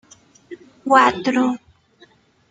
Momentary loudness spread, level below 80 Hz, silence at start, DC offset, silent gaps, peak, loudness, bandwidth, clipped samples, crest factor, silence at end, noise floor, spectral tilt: 17 LU; -62 dBFS; 0.5 s; under 0.1%; none; -2 dBFS; -17 LUFS; 9.2 kHz; under 0.1%; 20 dB; 0.95 s; -53 dBFS; -4 dB/octave